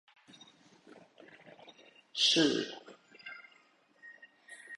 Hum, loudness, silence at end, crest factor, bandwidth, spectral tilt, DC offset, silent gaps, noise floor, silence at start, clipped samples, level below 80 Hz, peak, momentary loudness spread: none; -29 LUFS; 0 s; 22 dB; 11.5 kHz; -2.5 dB/octave; under 0.1%; none; -67 dBFS; 2.15 s; under 0.1%; -80 dBFS; -16 dBFS; 29 LU